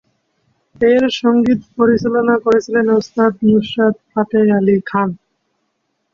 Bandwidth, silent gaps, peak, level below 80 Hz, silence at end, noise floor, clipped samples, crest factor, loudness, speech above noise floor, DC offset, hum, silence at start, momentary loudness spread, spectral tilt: 7.2 kHz; none; -2 dBFS; -52 dBFS; 1 s; -69 dBFS; under 0.1%; 14 dB; -14 LUFS; 55 dB; under 0.1%; none; 0.8 s; 5 LU; -7 dB/octave